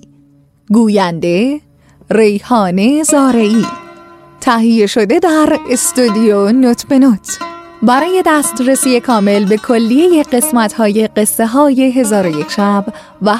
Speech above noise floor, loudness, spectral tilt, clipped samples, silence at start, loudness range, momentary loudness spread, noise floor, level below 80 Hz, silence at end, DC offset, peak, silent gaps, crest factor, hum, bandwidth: 37 dB; -11 LUFS; -4.5 dB/octave; under 0.1%; 0.7 s; 2 LU; 6 LU; -47 dBFS; -50 dBFS; 0 s; under 0.1%; 0 dBFS; none; 12 dB; none; 15.5 kHz